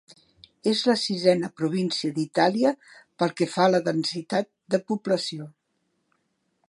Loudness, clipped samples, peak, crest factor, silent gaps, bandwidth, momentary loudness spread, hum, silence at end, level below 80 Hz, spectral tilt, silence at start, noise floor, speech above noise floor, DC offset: -25 LUFS; under 0.1%; -4 dBFS; 20 dB; none; 11.5 kHz; 7 LU; none; 1.2 s; -74 dBFS; -5 dB/octave; 0.65 s; -74 dBFS; 50 dB; under 0.1%